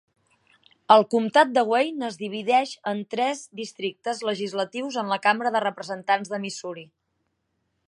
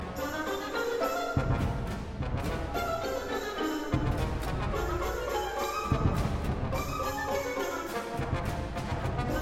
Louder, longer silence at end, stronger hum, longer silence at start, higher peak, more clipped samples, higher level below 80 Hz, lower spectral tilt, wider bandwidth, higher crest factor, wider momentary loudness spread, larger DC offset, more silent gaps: first, -24 LUFS vs -32 LUFS; first, 1.05 s vs 0 s; neither; first, 0.9 s vs 0 s; first, -2 dBFS vs -12 dBFS; neither; second, -80 dBFS vs -38 dBFS; second, -4 dB/octave vs -6 dB/octave; second, 11 kHz vs 16 kHz; first, 24 dB vs 18 dB; first, 14 LU vs 5 LU; neither; neither